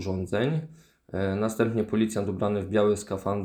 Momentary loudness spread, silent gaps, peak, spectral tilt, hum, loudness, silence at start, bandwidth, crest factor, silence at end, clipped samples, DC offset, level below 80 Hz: 7 LU; none; -10 dBFS; -6.5 dB/octave; none; -27 LUFS; 0 s; 19 kHz; 18 dB; 0 s; under 0.1%; under 0.1%; -58 dBFS